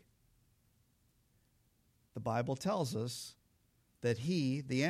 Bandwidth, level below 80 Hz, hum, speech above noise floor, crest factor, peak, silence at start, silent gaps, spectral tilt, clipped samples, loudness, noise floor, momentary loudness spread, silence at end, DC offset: 15.5 kHz; -72 dBFS; none; 38 dB; 18 dB; -22 dBFS; 2.15 s; none; -6 dB/octave; under 0.1%; -37 LUFS; -74 dBFS; 10 LU; 0 s; under 0.1%